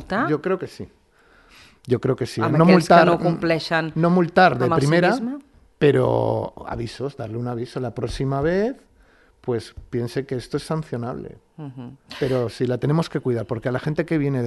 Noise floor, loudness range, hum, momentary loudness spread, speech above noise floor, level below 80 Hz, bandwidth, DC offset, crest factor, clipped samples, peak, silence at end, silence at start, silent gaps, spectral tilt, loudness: -55 dBFS; 10 LU; none; 18 LU; 34 dB; -48 dBFS; 12 kHz; under 0.1%; 22 dB; under 0.1%; 0 dBFS; 0 s; 0 s; none; -7 dB/octave; -21 LUFS